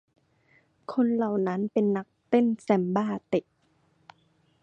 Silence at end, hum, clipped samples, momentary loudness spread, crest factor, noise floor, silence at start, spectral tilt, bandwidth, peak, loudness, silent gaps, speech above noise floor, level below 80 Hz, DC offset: 1.2 s; none; under 0.1%; 7 LU; 20 dB; -67 dBFS; 0.9 s; -8.5 dB/octave; 9 kHz; -8 dBFS; -27 LUFS; none; 42 dB; -72 dBFS; under 0.1%